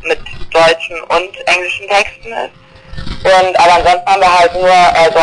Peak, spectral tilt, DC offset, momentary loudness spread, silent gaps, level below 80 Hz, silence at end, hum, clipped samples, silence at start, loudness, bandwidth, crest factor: -2 dBFS; -3 dB/octave; under 0.1%; 15 LU; none; -34 dBFS; 0 s; none; under 0.1%; 0 s; -10 LUFS; 10.5 kHz; 8 dB